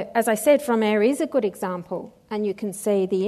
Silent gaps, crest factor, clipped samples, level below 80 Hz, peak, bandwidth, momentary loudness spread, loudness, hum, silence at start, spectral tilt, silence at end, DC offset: none; 16 dB; under 0.1%; -66 dBFS; -6 dBFS; 13.5 kHz; 12 LU; -23 LUFS; none; 0 s; -5 dB/octave; 0 s; under 0.1%